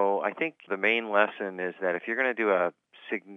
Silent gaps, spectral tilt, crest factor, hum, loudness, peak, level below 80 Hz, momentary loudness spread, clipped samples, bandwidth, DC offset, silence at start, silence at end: none; -6.5 dB/octave; 22 dB; none; -28 LUFS; -6 dBFS; under -90 dBFS; 9 LU; under 0.1%; 6.4 kHz; under 0.1%; 0 s; 0 s